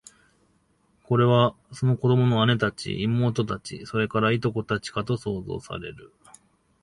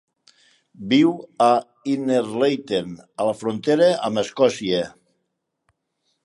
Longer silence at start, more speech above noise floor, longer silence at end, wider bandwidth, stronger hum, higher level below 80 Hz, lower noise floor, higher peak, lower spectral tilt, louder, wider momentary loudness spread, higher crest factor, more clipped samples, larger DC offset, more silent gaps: first, 1.1 s vs 0.8 s; second, 42 dB vs 56 dB; second, 0.75 s vs 1.35 s; about the same, 11 kHz vs 11.5 kHz; neither; first, -54 dBFS vs -64 dBFS; second, -65 dBFS vs -76 dBFS; about the same, -6 dBFS vs -4 dBFS; first, -7 dB/octave vs -5.5 dB/octave; second, -24 LUFS vs -21 LUFS; first, 13 LU vs 8 LU; about the same, 20 dB vs 18 dB; neither; neither; neither